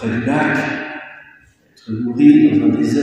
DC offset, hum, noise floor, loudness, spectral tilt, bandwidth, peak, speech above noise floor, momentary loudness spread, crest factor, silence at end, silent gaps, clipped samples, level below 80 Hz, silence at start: under 0.1%; none; -50 dBFS; -14 LUFS; -7 dB/octave; 8.6 kHz; 0 dBFS; 36 dB; 19 LU; 16 dB; 0 s; none; under 0.1%; -56 dBFS; 0 s